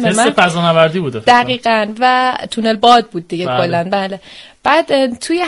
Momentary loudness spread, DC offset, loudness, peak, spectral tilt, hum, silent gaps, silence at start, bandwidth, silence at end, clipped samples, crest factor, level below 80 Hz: 8 LU; under 0.1%; -13 LUFS; 0 dBFS; -4.5 dB/octave; none; none; 0 s; 11.5 kHz; 0 s; under 0.1%; 14 dB; -52 dBFS